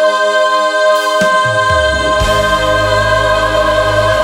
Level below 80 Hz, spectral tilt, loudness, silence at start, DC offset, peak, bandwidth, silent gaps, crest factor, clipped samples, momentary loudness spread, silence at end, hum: -26 dBFS; -3.5 dB/octave; -11 LUFS; 0 s; under 0.1%; 0 dBFS; 16.5 kHz; none; 10 dB; under 0.1%; 1 LU; 0 s; none